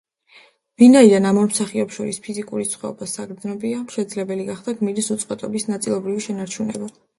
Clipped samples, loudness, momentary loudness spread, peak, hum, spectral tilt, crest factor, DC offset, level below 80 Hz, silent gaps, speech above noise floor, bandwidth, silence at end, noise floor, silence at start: under 0.1%; -20 LUFS; 16 LU; 0 dBFS; none; -5 dB/octave; 20 dB; under 0.1%; -64 dBFS; none; 33 dB; 11.5 kHz; 0.3 s; -52 dBFS; 0.8 s